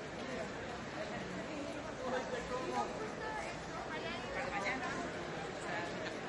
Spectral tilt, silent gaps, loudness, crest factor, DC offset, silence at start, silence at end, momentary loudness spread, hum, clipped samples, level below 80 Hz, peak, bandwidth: -4.5 dB/octave; none; -41 LUFS; 16 dB; under 0.1%; 0 s; 0 s; 5 LU; none; under 0.1%; -62 dBFS; -24 dBFS; 11.5 kHz